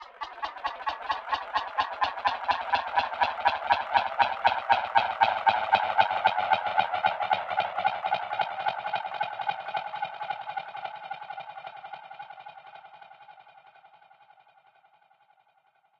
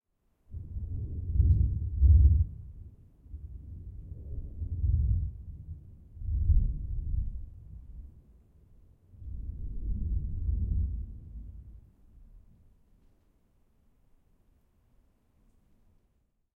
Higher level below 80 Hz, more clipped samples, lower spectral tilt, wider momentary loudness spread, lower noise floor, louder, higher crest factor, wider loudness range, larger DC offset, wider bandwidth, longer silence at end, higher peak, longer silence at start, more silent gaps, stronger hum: second, -66 dBFS vs -34 dBFS; neither; second, -3.5 dB/octave vs -13 dB/octave; second, 18 LU vs 23 LU; second, -67 dBFS vs -72 dBFS; first, -28 LUFS vs -31 LUFS; about the same, 22 dB vs 20 dB; first, 17 LU vs 13 LU; neither; first, 7.2 kHz vs 0.7 kHz; second, 2.1 s vs 4.15 s; first, -6 dBFS vs -12 dBFS; second, 0 s vs 0.5 s; neither; neither